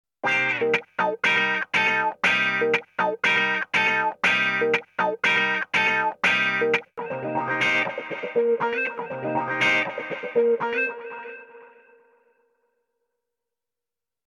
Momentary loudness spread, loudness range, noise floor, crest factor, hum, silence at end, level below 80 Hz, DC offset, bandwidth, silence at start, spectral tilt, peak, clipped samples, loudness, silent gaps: 8 LU; 6 LU; under -90 dBFS; 16 dB; none; 2.6 s; -72 dBFS; under 0.1%; 12 kHz; 0.25 s; -3.5 dB/octave; -8 dBFS; under 0.1%; -22 LUFS; none